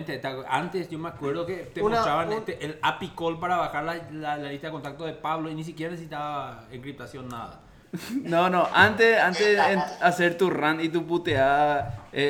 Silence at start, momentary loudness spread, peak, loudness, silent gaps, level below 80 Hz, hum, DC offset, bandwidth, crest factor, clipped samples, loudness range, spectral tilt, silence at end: 0 s; 17 LU; -4 dBFS; -25 LUFS; none; -56 dBFS; none; under 0.1%; 18 kHz; 22 dB; under 0.1%; 12 LU; -5 dB/octave; 0 s